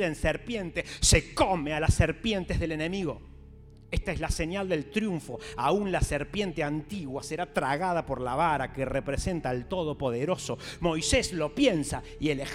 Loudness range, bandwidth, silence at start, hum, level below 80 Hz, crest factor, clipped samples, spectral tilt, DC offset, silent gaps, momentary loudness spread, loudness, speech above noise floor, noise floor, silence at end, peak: 4 LU; 16 kHz; 0 s; none; -40 dBFS; 22 dB; under 0.1%; -4.5 dB/octave; under 0.1%; none; 9 LU; -29 LUFS; 21 dB; -50 dBFS; 0 s; -6 dBFS